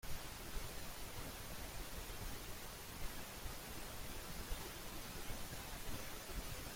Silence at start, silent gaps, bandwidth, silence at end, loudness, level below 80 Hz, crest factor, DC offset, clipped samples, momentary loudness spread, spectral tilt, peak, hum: 0.05 s; none; 16.5 kHz; 0 s; -49 LUFS; -52 dBFS; 18 dB; under 0.1%; under 0.1%; 2 LU; -3 dB/octave; -30 dBFS; none